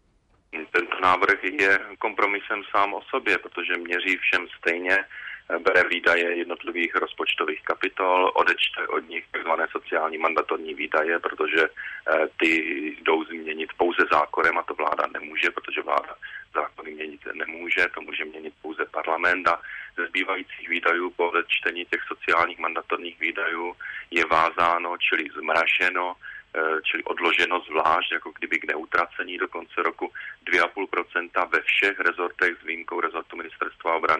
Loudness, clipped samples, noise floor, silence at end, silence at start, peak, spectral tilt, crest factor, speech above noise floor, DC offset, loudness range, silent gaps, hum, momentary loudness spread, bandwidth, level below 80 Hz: -24 LUFS; under 0.1%; -63 dBFS; 0 s; 0.55 s; -8 dBFS; -3.5 dB/octave; 18 dB; 38 dB; under 0.1%; 3 LU; none; none; 11 LU; 12 kHz; -64 dBFS